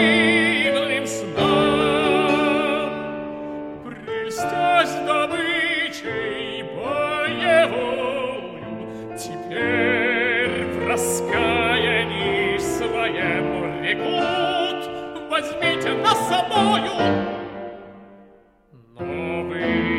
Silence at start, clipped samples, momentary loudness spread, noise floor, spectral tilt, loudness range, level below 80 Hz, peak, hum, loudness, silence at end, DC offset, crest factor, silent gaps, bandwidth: 0 s; under 0.1%; 13 LU; -52 dBFS; -4 dB/octave; 3 LU; -50 dBFS; -4 dBFS; none; -21 LUFS; 0 s; under 0.1%; 18 dB; none; 16 kHz